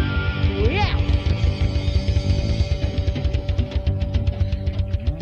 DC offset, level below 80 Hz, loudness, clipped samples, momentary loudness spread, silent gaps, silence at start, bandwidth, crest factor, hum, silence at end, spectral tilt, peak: under 0.1%; -24 dBFS; -22 LUFS; under 0.1%; 4 LU; none; 0 s; 7 kHz; 14 dB; none; 0 s; -7 dB/octave; -6 dBFS